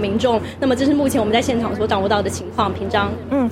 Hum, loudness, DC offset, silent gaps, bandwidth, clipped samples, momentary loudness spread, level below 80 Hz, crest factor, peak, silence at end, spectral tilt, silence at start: none; -19 LUFS; under 0.1%; none; 16 kHz; under 0.1%; 4 LU; -42 dBFS; 16 dB; -4 dBFS; 0 s; -5.5 dB/octave; 0 s